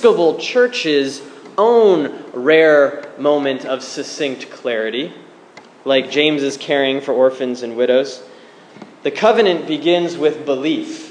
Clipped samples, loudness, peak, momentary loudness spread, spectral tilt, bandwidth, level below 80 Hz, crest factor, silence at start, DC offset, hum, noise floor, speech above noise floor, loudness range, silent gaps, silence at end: under 0.1%; -16 LUFS; 0 dBFS; 13 LU; -4 dB/octave; 10 kHz; -74 dBFS; 16 dB; 0 s; under 0.1%; none; -42 dBFS; 27 dB; 5 LU; none; 0 s